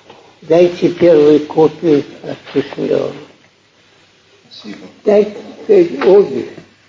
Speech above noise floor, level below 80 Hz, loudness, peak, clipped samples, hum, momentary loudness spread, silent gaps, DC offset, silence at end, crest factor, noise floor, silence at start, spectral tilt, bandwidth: 38 dB; -58 dBFS; -12 LUFS; 0 dBFS; under 0.1%; none; 19 LU; none; under 0.1%; 0.35 s; 14 dB; -50 dBFS; 0.5 s; -7.5 dB/octave; 7.6 kHz